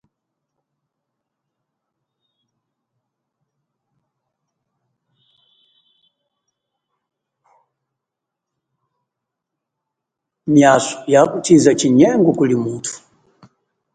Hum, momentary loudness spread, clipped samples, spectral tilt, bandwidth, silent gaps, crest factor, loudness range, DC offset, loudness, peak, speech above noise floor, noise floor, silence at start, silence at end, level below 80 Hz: none; 15 LU; under 0.1%; -5.5 dB/octave; 9.4 kHz; none; 20 dB; 6 LU; under 0.1%; -14 LUFS; 0 dBFS; 69 dB; -82 dBFS; 10.45 s; 1 s; -62 dBFS